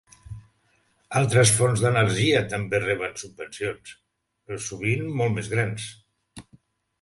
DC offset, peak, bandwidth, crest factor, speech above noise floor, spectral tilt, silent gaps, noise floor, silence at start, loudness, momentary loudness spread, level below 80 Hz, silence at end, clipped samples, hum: under 0.1%; -6 dBFS; 11.5 kHz; 20 dB; 43 dB; -4.5 dB/octave; none; -66 dBFS; 0.3 s; -23 LUFS; 19 LU; -54 dBFS; 0.6 s; under 0.1%; none